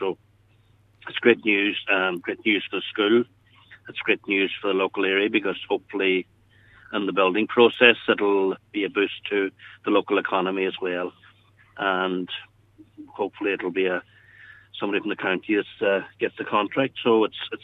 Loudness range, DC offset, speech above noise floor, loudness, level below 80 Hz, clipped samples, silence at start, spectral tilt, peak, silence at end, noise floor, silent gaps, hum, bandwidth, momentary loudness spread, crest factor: 7 LU; under 0.1%; 36 dB; -23 LUFS; -70 dBFS; under 0.1%; 0 s; -7 dB/octave; 0 dBFS; 0.05 s; -59 dBFS; none; none; 4.1 kHz; 11 LU; 24 dB